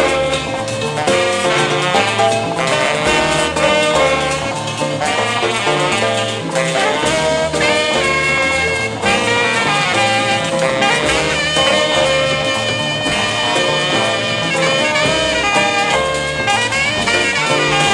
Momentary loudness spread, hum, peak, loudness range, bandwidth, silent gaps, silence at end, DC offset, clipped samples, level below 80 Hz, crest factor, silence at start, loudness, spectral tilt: 4 LU; none; 0 dBFS; 1 LU; 15 kHz; none; 0 s; under 0.1%; under 0.1%; -40 dBFS; 16 dB; 0 s; -14 LUFS; -3 dB/octave